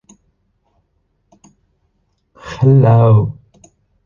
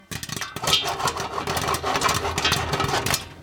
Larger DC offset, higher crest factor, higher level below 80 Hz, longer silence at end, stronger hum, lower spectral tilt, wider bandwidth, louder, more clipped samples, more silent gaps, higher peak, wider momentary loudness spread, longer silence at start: neither; about the same, 16 dB vs 20 dB; about the same, -46 dBFS vs -44 dBFS; first, 0.75 s vs 0 s; neither; first, -9.5 dB/octave vs -2.5 dB/octave; second, 7.2 kHz vs 19 kHz; first, -12 LUFS vs -23 LUFS; neither; neither; about the same, -2 dBFS vs -4 dBFS; first, 22 LU vs 8 LU; first, 2.45 s vs 0.1 s